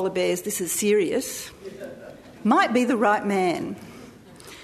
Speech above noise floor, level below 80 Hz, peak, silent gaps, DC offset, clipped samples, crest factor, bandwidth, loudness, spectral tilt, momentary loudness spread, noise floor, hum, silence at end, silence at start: 21 dB; -62 dBFS; -6 dBFS; none; under 0.1%; under 0.1%; 18 dB; 13.5 kHz; -23 LUFS; -4 dB/octave; 19 LU; -45 dBFS; none; 0 s; 0 s